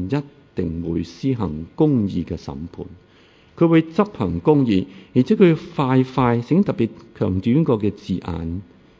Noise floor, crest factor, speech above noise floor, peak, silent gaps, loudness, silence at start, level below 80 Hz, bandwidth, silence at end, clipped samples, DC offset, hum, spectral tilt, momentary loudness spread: -51 dBFS; 18 dB; 32 dB; -2 dBFS; none; -20 LUFS; 0 s; -42 dBFS; 7.6 kHz; 0.35 s; under 0.1%; under 0.1%; none; -9 dB/octave; 14 LU